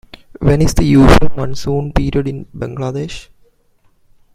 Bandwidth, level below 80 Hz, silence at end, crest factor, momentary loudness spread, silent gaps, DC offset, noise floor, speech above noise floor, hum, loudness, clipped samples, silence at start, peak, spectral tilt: 15.5 kHz; -22 dBFS; 1.15 s; 14 dB; 16 LU; none; under 0.1%; -54 dBFS; 42 dB; none; -15 LUFS; under 0.1%; 0.4 s; 0 dBFS; -6.5 dB/octave